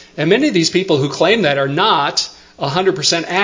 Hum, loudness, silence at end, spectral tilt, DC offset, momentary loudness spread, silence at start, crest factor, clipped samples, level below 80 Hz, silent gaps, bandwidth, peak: none; -15 LUFS; 0 s; -4 dB/octave; under 0.1%; 6 LU; 0 s; 16 dB; under 0.1%; -54 dBFS; none; 7.6 kHz; 0 dBFS